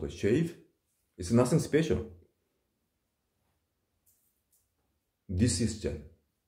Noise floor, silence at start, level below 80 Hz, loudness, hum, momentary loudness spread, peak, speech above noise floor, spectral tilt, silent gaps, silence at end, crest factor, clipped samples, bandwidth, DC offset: -80 dBFS; 0 s; -52 dBFS; -30 LUFS; none; 14 LU; -12 dBFS; 52 dB; -6 dB/octave; none; 0.4 s; 20 dB; under 0.1%; 16 kHz; under 0.1%